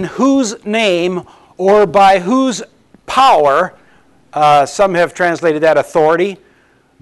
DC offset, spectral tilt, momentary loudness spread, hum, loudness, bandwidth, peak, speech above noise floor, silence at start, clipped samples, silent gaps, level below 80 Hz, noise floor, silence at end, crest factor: under 0.1%; -4.5 dB/octave; 10 LU; none; -12 LUFS; 12 kHz; -2 dBFS; 40 dB; 0 s; under 0.1%; none; -50 dBFS; -52 dBFS; 0.65 s; 10 dB